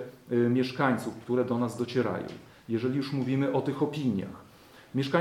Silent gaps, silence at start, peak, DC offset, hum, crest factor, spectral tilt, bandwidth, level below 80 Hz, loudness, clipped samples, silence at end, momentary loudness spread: none; 0 s; -12 dBFS; under 0.1%; none; 18 dB; -7 dB/octave; 14.5 kHz; -68 dBFS; -29 LUFS; under 0.1%; 0 s; 10 LU